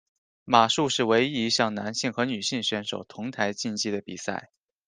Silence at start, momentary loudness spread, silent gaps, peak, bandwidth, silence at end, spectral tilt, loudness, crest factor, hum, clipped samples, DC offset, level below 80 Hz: 0.45 s; 12 LU; none; -4 dBFS; 10 kHz; 0.4 s; -3.5 dB/octave; -26 LUFS; 22 dB; none; under 0.1%; under 0.1%; -70 dBFS